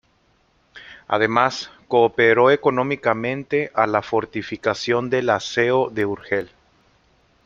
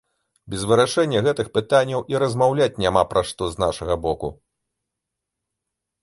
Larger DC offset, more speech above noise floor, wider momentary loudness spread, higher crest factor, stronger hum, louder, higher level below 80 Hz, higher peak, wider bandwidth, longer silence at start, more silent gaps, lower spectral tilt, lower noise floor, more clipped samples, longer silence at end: neither; second, 42 dB vs 62 dB; about the same, 10 LU vs 8 LU; about the same, 20 dB vs 20 dB; neither; about the same, -20 LUFS vs -21 LUFS; second, -60 dBFS vs -46 dBFS; about the same, -2 dBFS vs -2 dBFS; second, 7.6 kHz vs 11.5 kHz; first, 0.75 s vs 0.45 s; neither; about the same, -5.5 dB/octave vs -5 dB/octave; second, -61 dBFS vs -83 dBFS; neither; second, 1 s vs 1.7 s